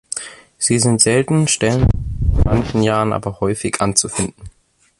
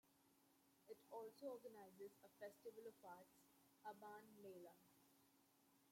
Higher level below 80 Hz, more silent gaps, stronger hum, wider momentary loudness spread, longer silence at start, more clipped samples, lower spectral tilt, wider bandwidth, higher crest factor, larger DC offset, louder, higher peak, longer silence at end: first, -26 dBFS vs under -90 dBFS; neither; neither; about the same, 9 LU vs 8 LU; about the same, 0.1 s vs 0.05 s; neither; about the same, -4.5 dB/octave vs -4.5 dB/octave; second, 11.5 kHz vs 16.5 kHz; about the same, 18 dB vs 18 dB; neither; first, -17 LUFS vs -61 LUFS; first, 0 dBFS vs -44 dBFS; first, 0.5 s vs 0 s